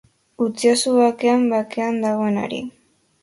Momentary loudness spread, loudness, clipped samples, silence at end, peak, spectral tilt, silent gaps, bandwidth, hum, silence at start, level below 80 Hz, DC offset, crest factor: 10 LU; -19 LUFS; under 0.1%; 0.5 s; -4 dBFS; -4.5 dB/octave; none; 11.5 kHz; none; 0.4 s; -64 dBFS; under 0.1%; 16 dB